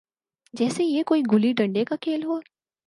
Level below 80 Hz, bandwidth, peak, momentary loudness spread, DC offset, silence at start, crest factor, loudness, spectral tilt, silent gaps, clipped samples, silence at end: -74 dBFS; 11.5 kHz; -8 dBFS; 9 LU; under 0.1%; 0.55 s; 16 dB; -24 LUFS; -6 dB/octave; none; under 0.1%; 0.45 s